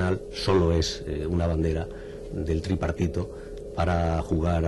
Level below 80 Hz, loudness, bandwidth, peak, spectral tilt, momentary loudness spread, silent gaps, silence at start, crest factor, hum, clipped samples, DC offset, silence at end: -36 dBFS; -27 LUFS; 11.5 kHz; -12 dBFS; -6.5 dB/octave; 13 LU; none; 0 s; 14 dB; none; under 0.1%; under 0.1%; 0 s